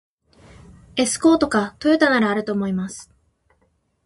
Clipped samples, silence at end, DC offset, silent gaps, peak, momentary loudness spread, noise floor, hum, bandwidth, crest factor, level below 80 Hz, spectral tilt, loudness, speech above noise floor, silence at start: under 0.1%; 1.05 s; under 0.1%; none; -2 dBFS; 12 LU; -66 dBFS; none; 11.5 kHz; 18 dB; -54 dBFS; -4.5 dB/octave; -19 LUFS; 47 dB; 0.95 s